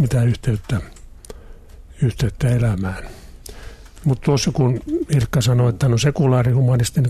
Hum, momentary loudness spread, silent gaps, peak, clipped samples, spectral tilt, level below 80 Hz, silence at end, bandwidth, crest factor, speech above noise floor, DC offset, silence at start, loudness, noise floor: none; 22 LU; none; -6 dBFS; under 0.1%; -6.5 dB/octave; -36 dBFS; 0 s; 13.5 kHz; 14 dB; 22 dB; under 0.1%; 0 s; -19 LUFS; -39 dBFS